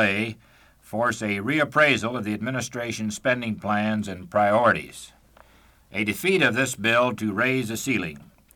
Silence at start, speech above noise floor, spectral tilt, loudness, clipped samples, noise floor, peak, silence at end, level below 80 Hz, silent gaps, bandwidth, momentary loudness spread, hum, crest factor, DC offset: 0 s; 32 dB; -4.5 dB/octave; -23 LUFS; under 0.1%; -56 dBFS; -6 dBFS; 0.35 s; -58 dBFS; none; 19 kHz; 10 LU; none; 18 dB; under 0.1%